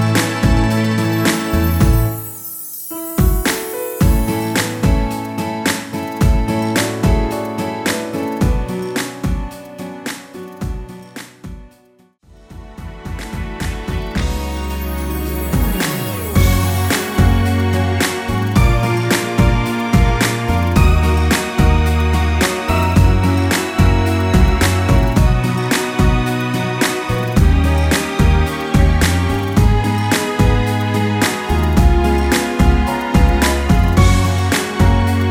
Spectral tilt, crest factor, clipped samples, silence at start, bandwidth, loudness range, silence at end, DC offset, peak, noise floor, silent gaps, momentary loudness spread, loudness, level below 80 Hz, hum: -5.5 dB/octave; 14 dB; under 0.1%; 0 s; over 20 kHz; 11 LU; 0 s; under 0.1%; 0 dBFS; -51 dBFS; none; 12 LU; -16 LUFS; -20 dBFS; none